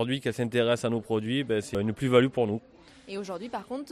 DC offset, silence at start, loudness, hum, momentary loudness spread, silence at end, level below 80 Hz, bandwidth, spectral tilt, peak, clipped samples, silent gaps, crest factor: under 0.1%; 0 s; -28 LUFS; none; 13 LU; 0 s; -60 dBFS; 13.5 kHz; -6 dB/octave; -8 dBFS; under 0.1%; none; 20 dB